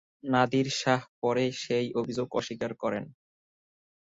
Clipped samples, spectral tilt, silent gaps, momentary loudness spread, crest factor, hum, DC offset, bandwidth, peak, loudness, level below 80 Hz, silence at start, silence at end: under 0.1%; -5 dB/octave; 1.09-1.22 s; 7 LU; 20 dB; none; under 0.1%; 7.8 kHz; -10 dBFS; -29 LUFS; -68 dBFS; 0.25 s; 0.95 s